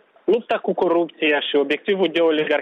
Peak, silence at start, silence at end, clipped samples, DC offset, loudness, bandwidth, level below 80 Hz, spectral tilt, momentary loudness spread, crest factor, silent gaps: -8 dBFS; 0.25 s; 0 s; under 0.1%; under 0.1%; -20 LUFS; 7 kHz; -70 dBFS; -6.5 dB/octave; 3 LU; 12 dB; none